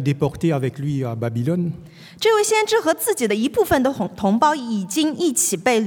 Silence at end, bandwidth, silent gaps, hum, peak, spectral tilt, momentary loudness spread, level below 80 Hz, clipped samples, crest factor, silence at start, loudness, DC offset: 0 s; 18 kHz; none; none; -4 dBFS; -4.5 dB/octave; 7 LU; -52 dBFS; under 0.1%; 16 dB; 0 s; -20 LUFS; under 0.1%